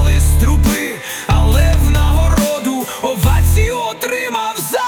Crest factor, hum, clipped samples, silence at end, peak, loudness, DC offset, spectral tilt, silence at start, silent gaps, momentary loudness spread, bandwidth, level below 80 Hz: 10 dB; none; under 0.1%; 0 s; -2 dBFS; -15 LUFS; under 0.1%; -5 dB/octave; 0 s; none; 7 LU; 19 kHz; -16 dBFS